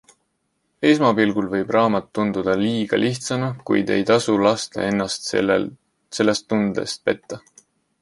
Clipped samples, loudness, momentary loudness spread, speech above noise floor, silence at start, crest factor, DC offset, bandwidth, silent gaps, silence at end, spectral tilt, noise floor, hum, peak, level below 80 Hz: under 0.1%; -20 LUFS; 7 LU; 51 dB; 0.8 s; 18 dB; under 0.1%; 11.5 kHz; none; 0.65 s; -5 dB/octave; -71 dBFS; none; -2 dBFS; -56 dBFS